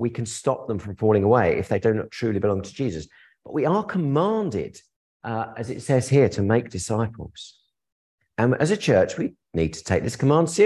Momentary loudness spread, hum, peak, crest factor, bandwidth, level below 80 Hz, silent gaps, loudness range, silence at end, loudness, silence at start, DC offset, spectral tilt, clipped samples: 12 LU; none; -4 dBFS; 18 dB; 12 kHz; -46 dBFS; 4.96-5.20 s, 7.92-8.18 s; 3 LU; 0 s; -23 LUFS; 0 s; under 0.1%; -6.5 dB/octave; under 0.1%